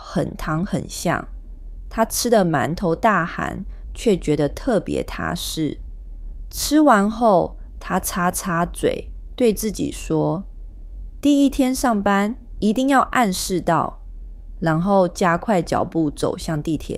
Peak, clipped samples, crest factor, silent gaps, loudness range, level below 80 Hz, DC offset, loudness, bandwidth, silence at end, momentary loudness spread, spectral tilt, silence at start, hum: -2 dBFS; under 0.1%; 18 dB; none; 3 LU; -36 dBFS; under 0.1%; -20 LUFS; 16 kHz; 0 s; 21 LU; -5 dB/octave; 0 s; none